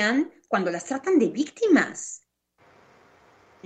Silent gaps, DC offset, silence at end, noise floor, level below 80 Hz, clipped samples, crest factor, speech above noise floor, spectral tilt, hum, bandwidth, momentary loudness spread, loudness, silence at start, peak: none; under 0.1%; 1.5 s; -62 dBFS; -74 dBFS; under 0.1%; 18 dB; 39 dB; -4.5 dB/octave; none; 9 kHz; 14 LU; -24 LUFS; 0 s; -8 dBFS